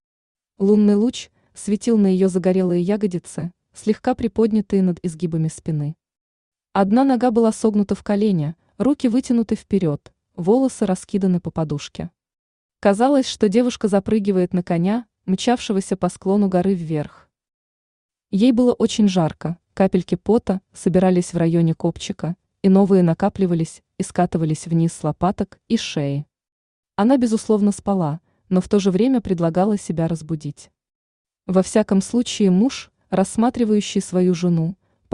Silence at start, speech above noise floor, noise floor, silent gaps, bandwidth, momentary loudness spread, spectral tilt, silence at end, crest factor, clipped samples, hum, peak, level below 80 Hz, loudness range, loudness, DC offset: 0.6 s; over 72 dB; under -90 dBFS; 6.21-6.52 s, 12.39-12.69 s, 17.54-18.09 s, 26.52-26.83 s, 30.95-31.25 s; 11 kHz; 11 LU; -7 dB/octave; 0.4 s; 16 dB; under 0.1%; none; -4 dBFS; -52 dBFS; 3 LU; -20 LUFS; under 0.1%